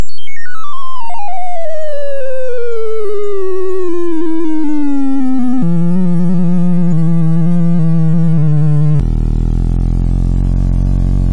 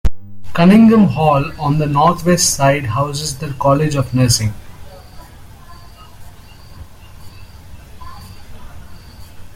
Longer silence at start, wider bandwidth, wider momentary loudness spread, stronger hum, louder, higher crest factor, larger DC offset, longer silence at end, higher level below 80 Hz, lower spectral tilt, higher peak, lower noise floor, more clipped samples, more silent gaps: about the same, 0 s vs 0.05 s; second, 9 kHz vs 16 kHz; second, 11 LU vs 16 LU; neither; about the same, -15 LUFS vs -14 LUFS; second, 8 dB vs 16 dB; first, 40% vs under 0.1%; about the same, 0 s vs 0.05 s; first, -20 dBFS vs -34 dBFS; first, -9.5 dB/octave vs -5.5 dB/octave; about the same, 0 dBFS vs 0 dBFS; second, -31 dBFS vs -37 dBFS; neither; neither